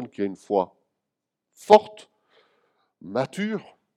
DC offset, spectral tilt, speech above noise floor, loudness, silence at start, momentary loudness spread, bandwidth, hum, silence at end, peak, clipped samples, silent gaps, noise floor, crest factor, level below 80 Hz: under 0.1%; -5.5 dB/octave; 61 dB; -23 LUFS; 0 s; 17 LU; 13 kHz; none; 0.35 s; 0 dBFS; under 0.1%; none; -84 dBFS; 26 dB; -74 dBFS